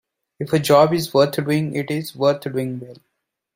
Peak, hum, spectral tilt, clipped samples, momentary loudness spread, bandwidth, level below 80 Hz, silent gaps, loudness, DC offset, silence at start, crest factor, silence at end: -2 dBFS; none; -6 dB/octave; under 0.1%; 12 LU; 16.5 kHz; -60 dBFS; none; -19 LUFS; under 0.1%; 0.4 s; 18 dB; 0.65 s